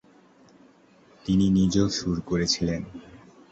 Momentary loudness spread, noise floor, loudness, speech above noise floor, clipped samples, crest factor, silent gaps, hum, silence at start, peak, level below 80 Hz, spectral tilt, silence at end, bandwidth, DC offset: 17 LU; -56 dBFS; -24 LUFS; 32 dB; under 0.1%; 18 dB; none; none; 1.25 s; -8 dBFS; -46 dBFS; -5.5 dB/octave; 0.35 s; 8.2 kHz; under 0.1%